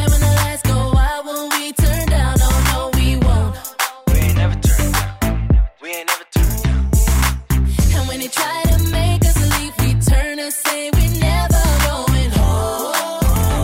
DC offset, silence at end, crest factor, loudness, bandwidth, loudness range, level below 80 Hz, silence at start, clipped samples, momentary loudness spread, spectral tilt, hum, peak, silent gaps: under 0.1%; 0 s; 10 dB; -17 LUFS; 16.5 kHz; 1 LU; -18 dBFS; 0 s; under 0.1%; 5 LU; -4.5 dB/octave; none; -4 dBFS; none